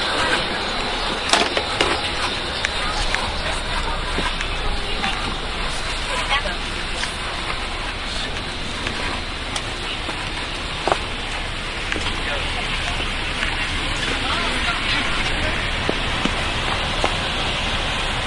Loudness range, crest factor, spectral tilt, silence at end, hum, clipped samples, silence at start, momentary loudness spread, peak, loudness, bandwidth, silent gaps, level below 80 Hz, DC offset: 4 LU; 22 dB; -3 dB/octave; 0 s; none; under 0.1%; 0 s; 6 LU; 0 dBFS; -22 LUFS; 11.5 kHz; none; -30 dBFS; under 0.1%